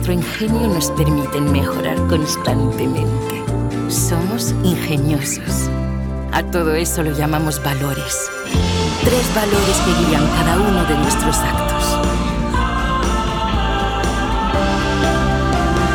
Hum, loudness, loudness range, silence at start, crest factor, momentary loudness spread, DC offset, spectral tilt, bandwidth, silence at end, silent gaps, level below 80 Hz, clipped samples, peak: none; -17 LUFS; 3 LU; 0 s; 16 dB; 5 LU; under 0.1%; -5 dB/octave; 19.5 kHz; 0 s; none; -24 dBFS; under 0.1%; 0 dBFS